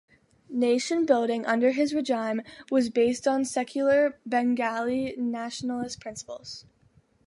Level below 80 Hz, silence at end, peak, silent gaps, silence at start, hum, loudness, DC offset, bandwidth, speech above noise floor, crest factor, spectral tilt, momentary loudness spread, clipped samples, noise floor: -66 dBFS; 0.65 s; -8 dBFS; none; 0.5 s; none; -26 LUFS; under 0.1%; 11.5 kHz; 37 dB; 18 dB; -4 dB/octave; 13 LU; under 0.1%; -63 dBFS